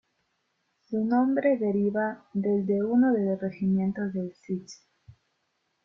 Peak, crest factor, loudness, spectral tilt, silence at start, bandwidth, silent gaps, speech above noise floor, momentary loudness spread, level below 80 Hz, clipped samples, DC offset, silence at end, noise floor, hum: -12 dBFS; 14 dB; -27 LUFS; -8.5 dB/octave; 0.9 s; 7.2 kHz; none; 50 dB; 11 LU; -68 dBFS; under 0.1%; under 0.1%; 0.75 s; -76 dBFS; none